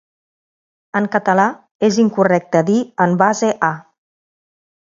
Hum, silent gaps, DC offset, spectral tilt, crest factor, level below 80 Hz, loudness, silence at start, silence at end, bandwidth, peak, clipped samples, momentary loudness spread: none; 1.71-1.79 s; under 0.1%; -6 dB/octave; 18 dB; -64 dBFS; -16 LUFS; 0.95 s; 1.15 s; 7.6 kHz; 0 dBFS; under 0.1%; 6 LU